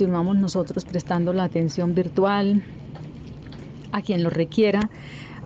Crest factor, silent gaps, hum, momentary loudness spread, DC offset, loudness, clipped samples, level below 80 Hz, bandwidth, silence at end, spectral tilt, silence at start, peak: 14 dB; none; none; 18 LU; under 0.1%; -23 LUFS; under 0.1%; -52 dBFS; 7.8 kHz; 0 s; -7.5 dB/octave; 0 s; -10 dBFS